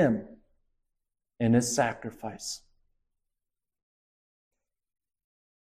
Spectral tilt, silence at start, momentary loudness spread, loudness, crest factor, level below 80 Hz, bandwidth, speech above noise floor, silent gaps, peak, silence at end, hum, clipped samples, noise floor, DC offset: -5 dB/octave; 0 s; 14 LU; -29 LUFS; 22 dB; -62 dBFS; 15 kHz; 62 dB; none; -12 dBFS; 3.2 s; none; under 0.1%; -89 dBFS; under 0.1%